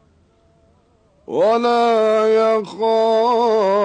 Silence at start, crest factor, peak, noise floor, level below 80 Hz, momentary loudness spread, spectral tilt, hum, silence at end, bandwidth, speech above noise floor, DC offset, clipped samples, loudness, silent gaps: 1.3 s; 10 dB; -8 dBFS; -56 dBFS; -62 dBFS; 4 LU; -5 dB/octave; none; 0 s; 9.4 kHz; 41 dB; under 0.1%; under 0.1%; -16 LUFS; none